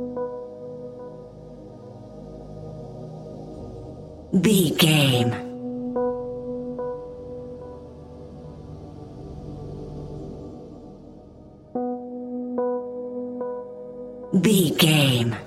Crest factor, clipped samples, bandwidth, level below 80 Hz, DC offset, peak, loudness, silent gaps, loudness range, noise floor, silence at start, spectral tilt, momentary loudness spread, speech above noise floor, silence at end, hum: 22 dB; under 0.1%; 16 kHz; -50 dBFS; under 0.1%; -4 dBFS; -23 LUFS; none; 16 LU; -46 dBFS; 0 s; -5 dB/octave; 24 LU; 27 dB; 0 s; none